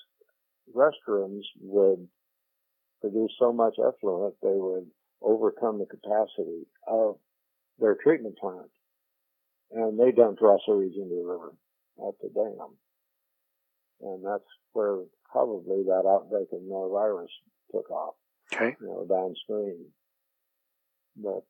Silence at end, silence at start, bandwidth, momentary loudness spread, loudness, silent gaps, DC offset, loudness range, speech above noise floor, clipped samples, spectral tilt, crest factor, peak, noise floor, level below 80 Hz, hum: 0.1 s; 0.75 s; 8.4 kHz; 14 LU; -28 LUFS; none; under 0.1%; 8 LU; 53 dB; under 0.1%; -7 dB/octave; 24 dB; -6 dBFS; -80 dBFS; under -90 dBFS; 60 Hz at -65 dBFS